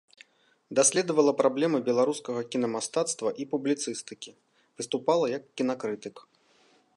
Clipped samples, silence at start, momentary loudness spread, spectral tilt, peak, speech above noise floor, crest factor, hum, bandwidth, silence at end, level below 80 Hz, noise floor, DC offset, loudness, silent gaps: under 0.1%; 0.7 s; 15 LU; -3.5 dB/octave; -10 dBFS; 36 dB; 18 dB; none; 11.5 kHz; 0.75 s; -82 dBFS; -64 dBFS; under 0.1%; -27 LUFS; none